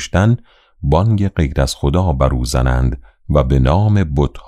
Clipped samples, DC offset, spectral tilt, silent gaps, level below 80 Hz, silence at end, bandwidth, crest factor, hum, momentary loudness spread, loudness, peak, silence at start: under 0.1%; under 0.1%; -7 dB/octave; none; -22 dBFS; 0.05 s; 14 kHz; 12 dB; none; 5 LU; -16 LUFS; -2 dBFS; 0 s